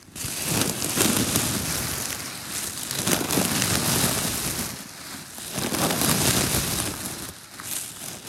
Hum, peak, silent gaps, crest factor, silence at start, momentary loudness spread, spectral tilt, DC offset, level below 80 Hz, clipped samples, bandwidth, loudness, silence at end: none; 0 dBFS; none; 26 dB; 0 s; 13 LU; -2.5 dB/octave; under 0.1%; -46 dBFS; under 0.1%; 17 kHz; -24 LUFS; 0 s